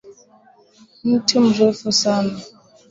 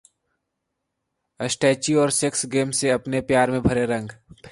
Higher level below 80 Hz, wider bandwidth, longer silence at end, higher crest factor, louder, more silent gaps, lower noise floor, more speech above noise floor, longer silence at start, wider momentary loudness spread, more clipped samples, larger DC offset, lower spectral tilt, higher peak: second, -60 dBFS vs -48 dBFS; second, 7.8 kHz vs 11.5 kHz; first, 0.45 s vs 0.05 s; about the same, 18 dB vs 18 dB; first, -17 LUFS vs -21 LUFS; neither; second, -52 dBFS vs -79 dBFS; second, 35 dB vs 57 dB; second, 0.05 s vs 1.4 s; about the same, 11 LU vs 9 LU; neither; neither; about the same, -4 dB/octave vs -4 dB/octave; about the same, -2 dBFS vs -4 dBFS